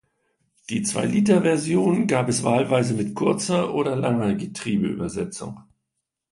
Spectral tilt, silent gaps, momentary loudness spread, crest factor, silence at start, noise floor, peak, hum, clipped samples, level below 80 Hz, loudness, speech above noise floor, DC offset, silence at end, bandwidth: -5.5 dB/octave; none; 10 LU; 18 dB; 0.7 s; -81 dBFS; -6 dBFS; none; under 0.1%; -56 dBFS; -22 LUFS; 59 dB; under 0.1%; 0.7 s; 11.5 kHz